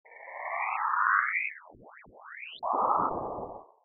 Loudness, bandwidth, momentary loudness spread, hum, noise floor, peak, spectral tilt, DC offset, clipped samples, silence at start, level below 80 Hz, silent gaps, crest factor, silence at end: -29 LUFS; 3.6 kHz; 19 LU; none; -53 dBFS; -10 dBFS; 3.5 dB/octave; under 0.1%; under 0.1%; 0.1 s; -64 dBFS; none; 22 dB; 0.25 s